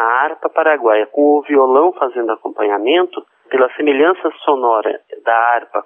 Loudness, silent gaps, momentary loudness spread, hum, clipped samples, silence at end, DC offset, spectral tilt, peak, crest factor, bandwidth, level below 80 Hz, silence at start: -15 LUFS; none; 8 LU; none; under 0.1%; 0.05 s; under 0.1%; -6.5 dB/octave; -2 dBFS; 14 dB; 3.7 kHz; -78 dBFS; 0 s